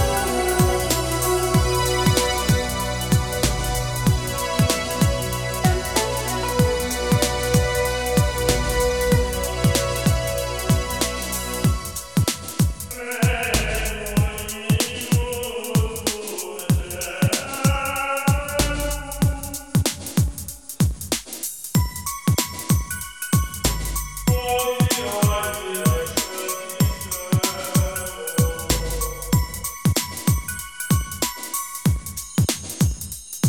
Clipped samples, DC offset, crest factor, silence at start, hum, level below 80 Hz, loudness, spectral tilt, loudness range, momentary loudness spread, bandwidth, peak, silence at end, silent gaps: under 0.1%; 0.3%; 20 dB; 0 s; none; -30 dBFS; -22 LUFS; -4.5 dB/octave; 3 LU; 7 LU; 19.5 kHz; -2 dBFS; 0 s; none